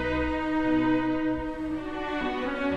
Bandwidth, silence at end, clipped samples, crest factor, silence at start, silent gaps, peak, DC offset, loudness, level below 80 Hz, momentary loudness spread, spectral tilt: 7.6 kHz; 0 s; under 0.1%; 12 dB; 0 s; none; -16 dBFS; under 0.1%; -28 LUFS; -44 dBFS; 8 LU; -7 dB/octave